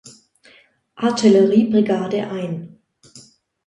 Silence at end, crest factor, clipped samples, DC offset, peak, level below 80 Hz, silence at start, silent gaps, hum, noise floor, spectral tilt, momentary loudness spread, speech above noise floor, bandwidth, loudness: 0.45 s; 18 dB; under 0.1%; under 0.1%; -2 dBFS; -62 dBFS; 0.05 s; none; none; -53 dBFS; -6.5 dB/octave; 13 LU; 37 dB; 10.5 kHz; -17 LUFS